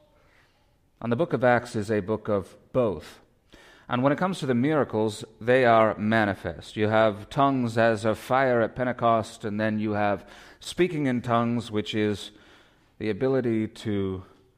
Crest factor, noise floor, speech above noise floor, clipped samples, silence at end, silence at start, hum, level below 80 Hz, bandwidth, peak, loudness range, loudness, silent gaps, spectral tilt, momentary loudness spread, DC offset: 18 dB; -64 dBFS; 39 dB; under 0.1%; 0.35 s; 1 s; none; -58 dBFS; 15 kHz; -8 dBFS; 4 LU; -25 LUFS; none; -6.5 dB/octave; 11 LU; under 0.1%